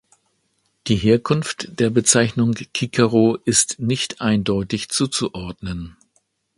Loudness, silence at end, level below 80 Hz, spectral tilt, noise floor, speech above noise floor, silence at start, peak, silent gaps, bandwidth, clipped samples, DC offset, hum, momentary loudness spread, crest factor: -19 LUFS; 0.65 s; -46 dBFS; -4 dB/octave; -68 dBFS; 48 dB; 0.85 s; 0 dBFS; none; 11.5 kHz; under 0.1%; under 0.1%; none; 14 LU; 20 dB